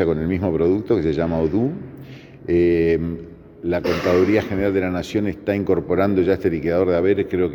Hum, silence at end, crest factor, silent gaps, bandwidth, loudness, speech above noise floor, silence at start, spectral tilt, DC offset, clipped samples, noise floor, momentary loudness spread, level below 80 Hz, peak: none; 0 s; 16 dB; none; 18 kHz; -20 LUFS; 20 dB; 0 s; -8 dB/octave; under 0.1%; under 0.1%; -39 dBFS; 11 LU; -46 dBFS; -4 dBFS